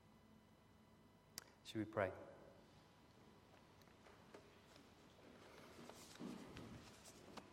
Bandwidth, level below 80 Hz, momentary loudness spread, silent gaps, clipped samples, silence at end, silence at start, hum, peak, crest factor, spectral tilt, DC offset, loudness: 16 kHz; -80 dBFS; 21 LU; none; under 0.1%; 0 s; 0 s; none; -26 dBFS; 28 dB; -5 dB/octave; under 0.1%; -53 LUFS